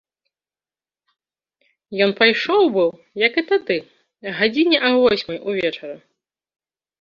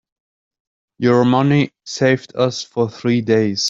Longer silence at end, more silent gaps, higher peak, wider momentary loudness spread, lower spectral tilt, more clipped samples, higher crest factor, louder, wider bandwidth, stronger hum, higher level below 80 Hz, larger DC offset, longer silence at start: first, 1.05 s vs 0 s; neither; about the same, -2 dBFS vs -2 dBFS; first, 14 LU vs 7 LU; about the same, -5.5 dB/octave vs -5.5 dB/octave; neither; about the same, 20 dB vs 16 dB; about the same, -18 LUFS vs -17 LUFS; second, 7 kHz vs 7.8 kHz; neither; about the same, -62 dBFS vs -58 dBFS; neither; first, 1.9 s vs 1 s